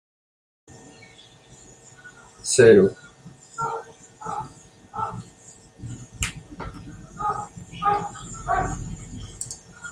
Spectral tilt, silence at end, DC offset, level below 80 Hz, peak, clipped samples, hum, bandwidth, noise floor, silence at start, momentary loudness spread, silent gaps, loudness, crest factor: -4.5 dB/octave; 0 s; under 0.1%; -46 dBFS; -2 dBFS; under 0.1%; none; 15.5 kHz; -50 dBFS; 0.7 s; 25 LU; none; -23 LUFS; 24 dB